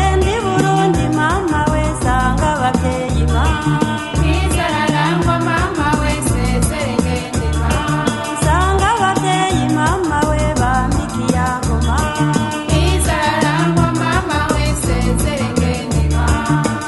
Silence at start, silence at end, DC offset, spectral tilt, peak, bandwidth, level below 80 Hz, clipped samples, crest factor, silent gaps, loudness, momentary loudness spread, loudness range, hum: 0 s; 0 s; under 0.1%; -5.5 dB/octave; 0 dBFS; 12 kHz; -22 dBFS; under 0.1%; 14 dB; none; -16 LUFS; 3 LU; 1 LU; none